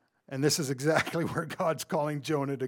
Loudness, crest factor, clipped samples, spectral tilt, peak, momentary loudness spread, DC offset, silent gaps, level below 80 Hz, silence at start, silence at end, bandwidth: -30 LUFS; 22 dB; under 0.1%; -4.5 dB/octave; -10 dBFS; 4 LU; under 0.1%; none; -70 dBFS; 0.3 s; 0 s; 19 kHz